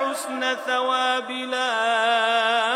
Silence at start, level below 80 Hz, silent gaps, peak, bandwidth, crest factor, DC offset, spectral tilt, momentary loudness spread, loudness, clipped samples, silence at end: 0 s; under -90 dBFS; none; -8 dBFS; 15.5 kHz; 14 dB; under 0.1%; -0.5 dB/octave; 6 LU; -22 LUFS; under 0.1%; 0 s